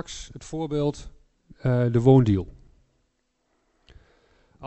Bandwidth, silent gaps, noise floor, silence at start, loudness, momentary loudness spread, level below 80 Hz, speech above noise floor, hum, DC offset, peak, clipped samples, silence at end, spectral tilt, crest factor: 8.2 kHz; none; -72 dBFS; 0.1 s; -22 LUFS; 21 LU; -48 dBFS; 50 dB; none; under 0.1%; -6 dBFS; under 0.1%; 0 s; -8 dB/octave; 20 dB